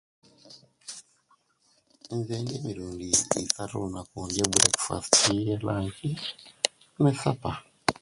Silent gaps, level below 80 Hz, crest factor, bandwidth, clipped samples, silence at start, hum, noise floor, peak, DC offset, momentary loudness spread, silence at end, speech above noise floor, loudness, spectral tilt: none; -54 dBFS; 30 dB; 12 kHz; under 0.1%; 0.45 s; none; -68 dBFS; 0 dBFS; under 0.1%; 16 LU; 0.1 s; 40 dB; -27 LUFS; -3 dB/octave